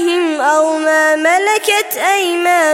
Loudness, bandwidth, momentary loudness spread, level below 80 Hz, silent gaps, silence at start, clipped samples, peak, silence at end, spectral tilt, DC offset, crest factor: -12 LUFS; 17 kHz; 3 LU; -68 dBFS; none; 0 s; under 0.1%; -2 dBFS; 0 s; 0 dB/octave; under 0.1%; 12 dB